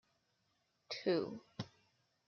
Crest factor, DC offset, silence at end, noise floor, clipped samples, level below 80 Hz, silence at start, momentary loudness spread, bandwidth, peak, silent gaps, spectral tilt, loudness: 20 dB; under 0.1%; 0.6 s; -81 dBFS; under 0.1%; -84 dBFS; 0.9 s; 13 LU; 6.8 kHz; -24 dBFS; none; -4.5 dB/octave; -41 LUFS